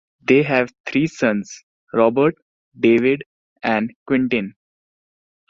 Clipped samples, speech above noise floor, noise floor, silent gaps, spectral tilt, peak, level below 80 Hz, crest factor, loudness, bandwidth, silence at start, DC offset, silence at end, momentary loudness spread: under 0.1%; over 72 dB; under -90 dBFS; 0.80-0.84 s, 1.63-1.87 s, 2.42-2.72 s, 3.26-3.56 s, 3.96-4.06 s; -6.5 dB/octave; -2 dBFS; -60 dBFS; 18 dB; -19 LUFS; 7.6 kHz; 0.3 s; under 0.1%; 1 s; 11 LU